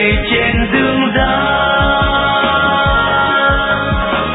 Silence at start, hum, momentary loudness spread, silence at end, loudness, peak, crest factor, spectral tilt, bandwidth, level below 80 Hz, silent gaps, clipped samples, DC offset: 0 s; none; 2 LU; 0 s; -12 LUFS; -2 dBFS; 12 dB; -8.5 dB/octave; 4.1 kHz; -24 dBFS; none; under 0.1%; under 0.1%